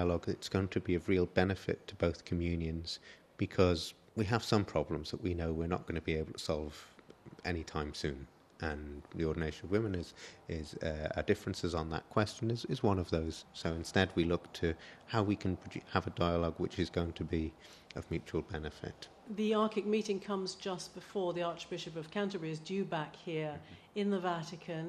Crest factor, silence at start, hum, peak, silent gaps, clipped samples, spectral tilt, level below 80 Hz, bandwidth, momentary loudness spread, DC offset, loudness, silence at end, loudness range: 24 dB; 0 s; none; -12 dBFS; none; under 0.1%; -6 dB/octave; -54 dBFS; 13 kHz; 11 LU; under 0.1%; -37 LUFS; 0 s; 4 LU